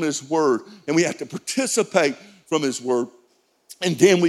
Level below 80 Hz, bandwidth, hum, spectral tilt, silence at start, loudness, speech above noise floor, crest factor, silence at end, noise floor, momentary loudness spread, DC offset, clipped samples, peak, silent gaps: -72 dBFS; 14.5 kHz; none; -4 dB/octave; 0 s; -22 LUFS; 41 dB; 20 dB; 0 s; -62 dBFS; 8 LU; under 0.1%; under 0.1%; -2 dBFS; none